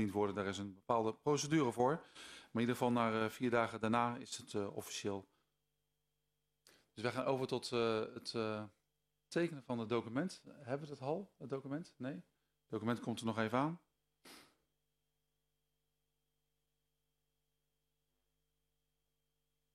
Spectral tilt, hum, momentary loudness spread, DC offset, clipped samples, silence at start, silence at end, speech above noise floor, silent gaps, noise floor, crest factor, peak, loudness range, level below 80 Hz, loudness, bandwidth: -5.5 dB/octave; 50 Hz at -75 dBFS; 12 LU; under 0.1%; under 0.1%; 0 s; 5.35 s; 48 dB; none; -87 dBFS; 22 dB; -18 dBFS; 7 LU; -78 dBFS; -39 LUFS; 15 kHz